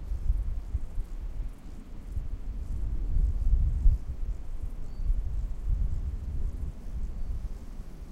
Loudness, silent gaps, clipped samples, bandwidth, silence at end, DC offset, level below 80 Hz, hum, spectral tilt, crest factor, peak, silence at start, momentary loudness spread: -35 LUFS; none; under 0.1%; 3.1 kHz; 0 s; under 0.1%; -30 dBFS; none; -8 dB/octave; 20 dB; -10 dBFS; 0 s; 13 LU